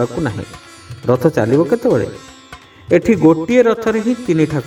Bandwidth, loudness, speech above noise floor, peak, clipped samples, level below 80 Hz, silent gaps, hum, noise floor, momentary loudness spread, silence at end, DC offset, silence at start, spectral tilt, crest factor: 15 kHz; -15 LUFS; 25 dB; 0 dBFS; under 0.1%; -46 dBFS; none; none; -39 dBFS; 15 LU; 0 s; under 0.1%; 0 s; -7.5 dB/octave; 14 dB